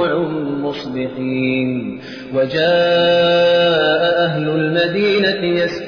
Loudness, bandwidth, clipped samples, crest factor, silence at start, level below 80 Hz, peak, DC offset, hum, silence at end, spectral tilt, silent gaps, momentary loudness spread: -16 LUFS; 5.4 kHz; under 0.1%; 12 dB; 0 s; -54 dBFS; -4 dBFS; 0.1%; none; 0 s; -6.5 dB/octave; none; 10 LU